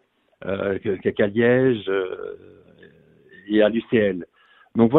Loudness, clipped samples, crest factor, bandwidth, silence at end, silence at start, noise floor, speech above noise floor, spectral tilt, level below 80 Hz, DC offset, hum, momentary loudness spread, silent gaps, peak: -22 LUFS; under 0.1%; 20 dB; 4.1 kHz; 0 s; 0.4 s; -52 dBFS; 31 dB; -10.5 dB/octave; -58 dBFS; under 0.1%; none; 16 LU; none; -2 dBFS